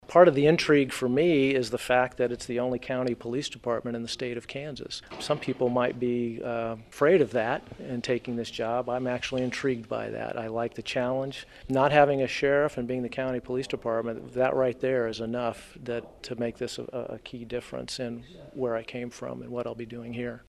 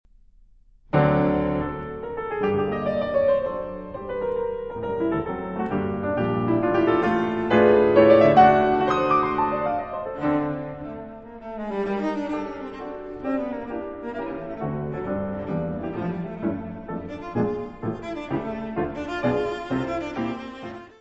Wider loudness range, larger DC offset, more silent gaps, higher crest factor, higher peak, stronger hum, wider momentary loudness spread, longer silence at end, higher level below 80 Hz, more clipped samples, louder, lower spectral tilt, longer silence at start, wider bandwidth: second, 8 LU vs 12 LU; neither; neither; about the same, 24 dB vs 20 dB; about the same, -4 dBFS vs -4 dBFS; neither; about the same, 14 LU vs 16 LU; about the same, 0.1 s vs 0.1 s; second, -58 dBFS vs -48 dBFS; neither; second, -28 LUFS vs -24 LUFS; second, -5.5 dB/octave vs -8.5 dB/octave; second, 0.1 s vs 0.95 s; first, 13.5 kHz vs 7.8 kHz